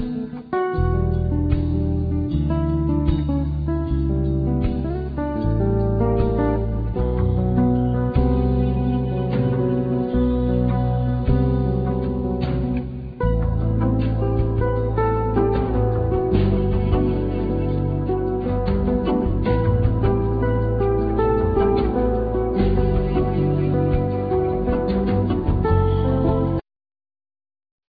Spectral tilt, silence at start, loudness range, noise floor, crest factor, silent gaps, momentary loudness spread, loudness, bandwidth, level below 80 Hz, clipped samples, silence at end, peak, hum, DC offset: -12 dB/octave; 0 s; 2 LU; under -90 dBFS; 14 dB; none; 4 LU; -21 LUFS; 4.9 kHz; -26 dBFS; under 0.1%; 1.3 s; -6 dBFS; none; under 0.1%